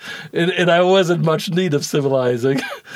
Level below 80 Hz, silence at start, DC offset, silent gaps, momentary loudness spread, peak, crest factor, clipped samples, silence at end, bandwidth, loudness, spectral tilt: -68 dBFS; 0 s; under 0.1%; none; 6 LU; -4 dBFS; 14 dB; under 0.1%; 0 s; 15.5 kHz; -17 LUFS; -5.5 dB/octave